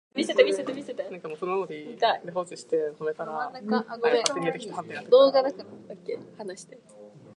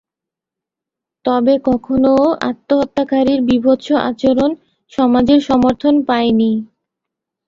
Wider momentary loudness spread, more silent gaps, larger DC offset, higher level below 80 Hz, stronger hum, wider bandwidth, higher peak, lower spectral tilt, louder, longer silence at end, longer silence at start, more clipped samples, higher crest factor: first, 17 LU vs 6 LU; neither; neither; second, -80 dBFS vs -46 dBFS; neither; first, 11.5 kHz vs 7.4 kHz; about the same, -2 dBFS vs -2 dBFS; second, -3.5 dB/octave vs -7 dB/octave; second, -26 LUFS vs -14 LUFS; second, 0.05 s vs 0.85 s; second, 0.15 s vs 1.25 s; neither; first, 24 dB vs 14 dB